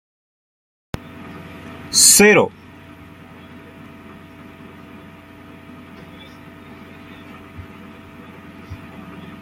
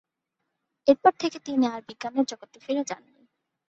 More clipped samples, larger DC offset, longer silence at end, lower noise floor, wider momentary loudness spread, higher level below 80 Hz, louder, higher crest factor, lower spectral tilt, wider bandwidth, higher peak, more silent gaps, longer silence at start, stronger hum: neither; neither; second, 0.15 s vs 0.75 s; second, -41 dBFS vs -82 dBFS; first, 30 LU vs 15 LU; first, -54 dBFS vs -74 dBFS; first, -11 LUFS vs -26 LUFS; about the same, 22 dB vs 22 dB; second, -2 dB/octave vs -4 dB/octave; first, 16.5 kHz vs 8 kHz; first, 0 dBFS vs -4 dBFS; neither; first, 1.3 s vs 0.85 s; neither